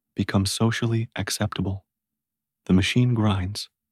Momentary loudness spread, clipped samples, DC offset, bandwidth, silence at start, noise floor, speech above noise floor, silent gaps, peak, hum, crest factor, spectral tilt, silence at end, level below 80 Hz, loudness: 11 LU; under 0.1%; under 0.1%; 15 kHz; 0.15 s; -87 dBFS; 64 dB; none; -8 dBFS; none; 16 dB; -5.5 dB/octave; 0.25 s; -50 dBFS; -24 LUFS